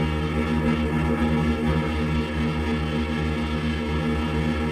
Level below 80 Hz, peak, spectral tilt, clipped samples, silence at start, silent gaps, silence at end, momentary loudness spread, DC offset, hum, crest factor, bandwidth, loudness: -34 dBFS; -10 dBFS; -7 dB/octave; under 0.1%; 0 s; none; 0 s; 3 LU; under 0.1%; none; 12 dB; 12.5 kHz; -24 LUFS